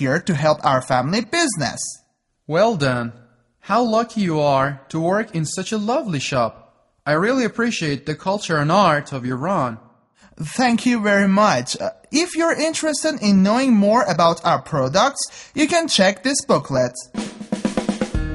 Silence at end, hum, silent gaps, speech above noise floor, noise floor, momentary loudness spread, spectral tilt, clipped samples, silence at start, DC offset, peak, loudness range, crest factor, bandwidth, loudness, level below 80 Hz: 0 s; none; none; 34 dB; -53 dBFS; 10 LU; -4.5 dB/octave; under 0.1%; 0 s; under 0.1%; -2 dBFS; 4 LU; 16 dB; 11.5 kHz; -19 LUFS; -44 dBFS